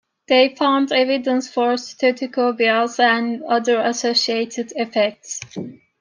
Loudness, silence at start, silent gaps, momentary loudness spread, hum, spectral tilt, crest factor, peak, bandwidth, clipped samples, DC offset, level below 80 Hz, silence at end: -18 LUFS; 0.3 s; none; 11 LU; none; -3 dB/octave; 16 dB; -4 dBFS; 10 kHz; under 0.1%; under 0.1%; -72 dBFS; 0.25 s